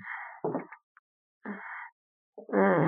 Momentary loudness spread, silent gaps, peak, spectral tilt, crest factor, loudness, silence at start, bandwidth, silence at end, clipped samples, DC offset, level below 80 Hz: 24 LU; 0.83-1.41 s, 1.92-2.33 s; -10 dBFS; -7.5 dB/octave; 22 dB; -33 LUFS; 0 s; 3.6 kHz; 0 s; under 0.1%; under 0.1%; -82 dBFS